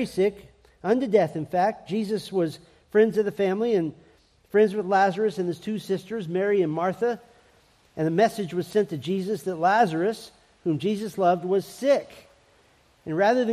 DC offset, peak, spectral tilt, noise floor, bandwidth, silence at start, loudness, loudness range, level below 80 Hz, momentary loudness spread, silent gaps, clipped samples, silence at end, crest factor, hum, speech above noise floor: under 0.1%; -8 dBFS; -6.5 dB/octave; -60 dBFS; 14.5 kHz; 0 s; -25 LUFS; 2 LU; -66 dBFS; 9 LU; none; under 0.1%; 0 s; 18 dB; none; 36 dB